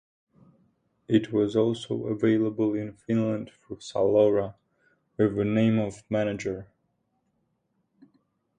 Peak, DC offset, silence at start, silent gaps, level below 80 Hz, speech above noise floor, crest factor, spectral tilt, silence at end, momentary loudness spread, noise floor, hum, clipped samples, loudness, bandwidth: -8 dBFS; under 0.1%; 1.1 s; none; -60 dBFS; 49 dB; 18 dB; -7.5 dB/octave; 1.95 s; 12 LU; -75 dBFS; none; under 0.1%; -26 LUFS; 9.8 kHz